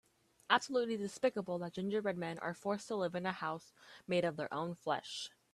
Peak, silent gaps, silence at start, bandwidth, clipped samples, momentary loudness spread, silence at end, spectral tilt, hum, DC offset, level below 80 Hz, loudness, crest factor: -12 dBFS; none; 0.5 s; 13 kHz; under 0.1%; 9 LU; 0.25 s; -4.5 dB/octave; none; under 0.1%; -78 dBFS; -38 LUFS; 26 dB